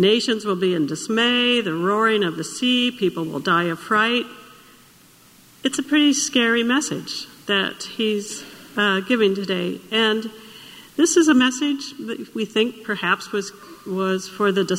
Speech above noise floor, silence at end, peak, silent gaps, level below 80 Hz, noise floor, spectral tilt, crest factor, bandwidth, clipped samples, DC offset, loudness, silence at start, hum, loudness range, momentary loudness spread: 30 dB; 0 s; -4 dBFS; none; -66 dBFS; -51 dBFS; -3.5 dB/octave; 18 dB; 16 kHz; under 0.1%; under 0.1%; -20 LUFS; 0 s; none; 3 LU; 13 LU